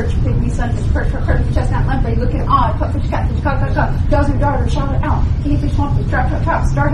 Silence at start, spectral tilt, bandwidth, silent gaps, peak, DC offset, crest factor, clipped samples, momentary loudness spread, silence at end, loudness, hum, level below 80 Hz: 0 s; -8 dB/octave; 10 kHz; none; 0 dBFS; under 0.1%; 14 dB; under 0.1%; 3 LU; 0 s; -17 LUFS; none; -18 dBFS